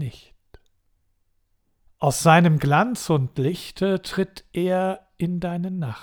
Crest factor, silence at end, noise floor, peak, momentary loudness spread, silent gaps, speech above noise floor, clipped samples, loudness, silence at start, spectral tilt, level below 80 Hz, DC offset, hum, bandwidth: 20 dB; 0 s; -67 dBFS; -2 dBFS; 12 LU; none; 46 dB; under 0.1%; -22 LUFS; 0 s; -6 dB/octave; -52 dBFS; under 0.1%; none; 19.5 kHz